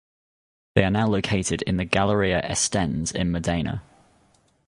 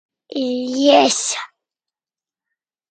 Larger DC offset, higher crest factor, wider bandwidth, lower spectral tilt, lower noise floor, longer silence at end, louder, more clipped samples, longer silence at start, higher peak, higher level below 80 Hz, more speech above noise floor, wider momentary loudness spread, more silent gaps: neither; about the same, 24 dB vs 20 dB; first, 11.5 kHz vs 9.4 kHz; first, -4.5 dB/octave vs -1.5 dB/octave; second, -62 dBFS vs under -90 dBFS; second, 0.85 s vs 1.45 s; second, -23 LUFS vs -17 LUFS; neither; first, 0.75 s vs 0.3 s; about the same, -2 dBFS vs 0 dBFS; first, -42 dBFS vs -74 dBFS; second, 39 dB vs over 74 dB; second, 5 LU vs 16 LU; neither